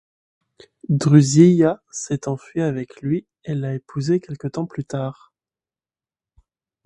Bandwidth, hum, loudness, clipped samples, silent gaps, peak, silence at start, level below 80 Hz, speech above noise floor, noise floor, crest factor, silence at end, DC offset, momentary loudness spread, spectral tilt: 10.5 kHz; none; -20 LUFS; under 0.1%; none; 0 dBFS; 0.9 s; -58 dBFS; over 71 dB; under -90 dBFS; 20 dB; 1.75 s; under 0.1%; 15 LU; -7 dB/octave